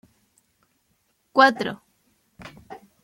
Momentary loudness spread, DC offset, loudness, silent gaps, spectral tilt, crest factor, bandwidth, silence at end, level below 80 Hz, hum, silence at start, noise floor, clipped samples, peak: 27 LU; under 0.1%; -20 LUFS; none; -4 dB/octave; 24 dB; 16.5 kHz; 0.25 s; -66 dBFS; none; 1.35 s; -69 dBFS; under 0.1%; -2 dBFS